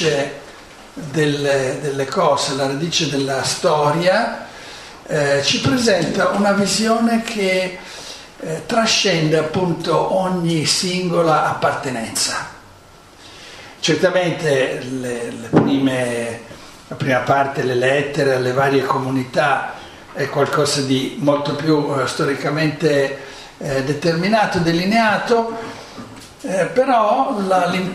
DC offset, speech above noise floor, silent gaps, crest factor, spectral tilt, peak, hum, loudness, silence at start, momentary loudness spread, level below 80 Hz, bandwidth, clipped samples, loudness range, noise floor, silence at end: under 0.1%; 26 dB; none; 18 dB; -4.5 dB/octave; 0 dBFS; none; -18 LUFS; 0 s; 16 LU; -52 dBFS; 14.5 kHz; under 0.1%; 2 LU; -44 dBFS; 0 s